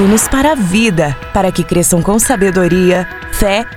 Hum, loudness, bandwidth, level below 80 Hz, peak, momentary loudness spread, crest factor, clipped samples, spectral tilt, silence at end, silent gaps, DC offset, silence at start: none; -12 LUFS; 17 kHz; -26 dBFS; 0 dBFS; 5 LU; 12 dB; under 0.1%; -4.5 dB/octave; 0 s; none; under 0.1%; 0 s